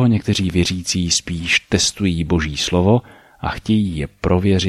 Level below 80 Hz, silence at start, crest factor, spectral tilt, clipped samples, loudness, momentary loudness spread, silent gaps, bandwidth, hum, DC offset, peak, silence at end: -36 dBFS; 0 s; 16 dB; -4.5 dB/octave; under 0.1%; -18 LUFS; 7 LU; none; 14 kHz; none; under 0.1%; -2 dBFS; 0 s